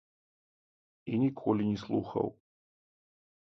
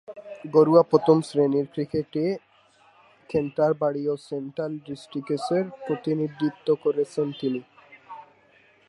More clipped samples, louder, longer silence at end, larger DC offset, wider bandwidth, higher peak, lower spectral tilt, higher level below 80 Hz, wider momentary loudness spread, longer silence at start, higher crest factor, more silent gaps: neither; second, -32 LUFS vs -25 LUFS; first, 1.25 s vs 0.65 s; neither; second, 6.4 kHz vs 11 kHz; second, -14 dBFS vs -4 dBFS; first, -9 dB/octave vs -7.5 dB/octave; about the same, -66 dBFS vs -66 dBFS; second, 7 LU vs 16 LU; first, 1.05 s vs 0.1 s; about the same, 20 dB vs 22 dB; neither